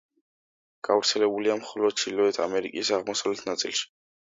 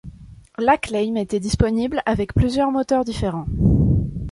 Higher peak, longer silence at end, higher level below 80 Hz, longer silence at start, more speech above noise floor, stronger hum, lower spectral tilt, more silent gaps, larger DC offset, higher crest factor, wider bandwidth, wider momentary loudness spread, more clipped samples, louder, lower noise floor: second, -8 dBFS vs -2 dBFS; first, 0.5 s vs 0 s; second, -72 dBFS vs -30 dBFS; first, 0.85 s vs 0.05 s; first, over 64 dB vs 21 dB; neither; second, -2 dB/octave vs -7 dB/octave; neither; neither; about the same, 20 dB vs 18 dB; second, 7.8 kHz vs 11.5 kHz; about the same, 6 LU vs 6 LU; neither; second, -26 LUFS vs -20 LUFS; first, under -90 dBFS vs -40 dBFS